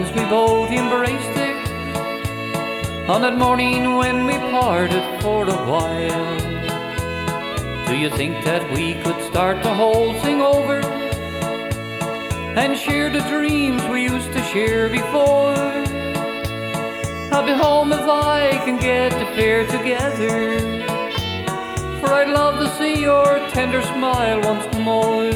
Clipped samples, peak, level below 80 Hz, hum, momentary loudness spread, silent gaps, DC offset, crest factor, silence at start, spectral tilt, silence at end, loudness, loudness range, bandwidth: under 0.1%; -4 dBFS; -38 dBFS; none; 8 LU; none; under 0.1%; 16 dB; 0 s; -5 dB/octave; 0 s; -19 LUFS; 3 LU; 19.5 kHz